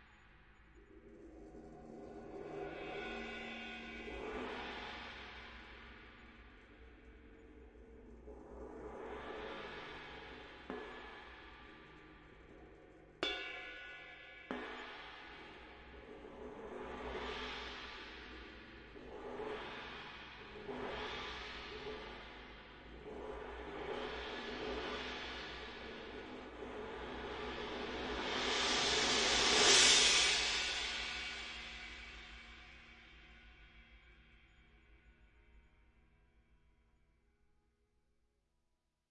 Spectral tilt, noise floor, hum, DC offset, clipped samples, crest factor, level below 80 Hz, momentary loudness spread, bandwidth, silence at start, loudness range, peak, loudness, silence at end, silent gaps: -1 dB/octave; -83 dBFS; none; under 0.1%; under 0.1%; 28 dB; -60 dBFS; 24 LU; 10.5 kHz; 0 s; 22 LU; -14 dBFS; -37 LUFS; 3.5 s; none